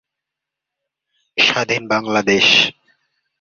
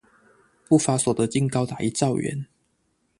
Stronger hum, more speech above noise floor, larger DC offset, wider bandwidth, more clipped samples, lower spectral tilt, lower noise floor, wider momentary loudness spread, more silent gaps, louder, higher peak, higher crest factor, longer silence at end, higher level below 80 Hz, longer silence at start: neither; first, 68 dB vs 47 dB; neither; second, 7.6 kHz vs 11.5 kHz; neither; second, -2.5 dB/octave vs -5.5 dB/octave; first, -83 dBFS vs -70 dBFS; second, 8 LU vs 11 LU; neither; first, -14 LUFS vs -23 LUFS; first, 0 dBFS vs -6 dBFS; about the same, 20 dB vs 20 dB; about the same, 0.7 s vs 0.75 s; about the same, -60 dBFS vs -58 dBFS; first, 1.35 s vs 0.7 s